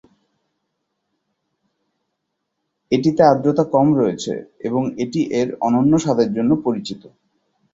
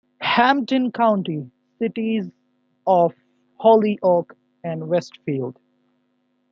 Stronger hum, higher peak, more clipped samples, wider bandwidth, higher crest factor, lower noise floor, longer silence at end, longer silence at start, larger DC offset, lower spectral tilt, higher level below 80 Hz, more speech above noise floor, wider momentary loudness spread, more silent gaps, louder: second, none vs 50 Hz at -50 dBFS; about the same, 0 dBFS vs -2 dBFS; neither; about the same, 7.8 kHz vs 7.4 kHz; about the same, 20 dB vs 20 dB; first, -76 dBFS vs -68 dBFS; second, 0.65 s vs 1 s; first, 2.9 s vs 0.2 s; neither; about the same, -7 dB/octave vs -7 dB/octave; first, -58 dBFS vs -72 dBFS; first, 58 dB vs 48 dB; second, 12 LU vs 15 LU; neither; about the same, -18 LUFS vs -20 LUFS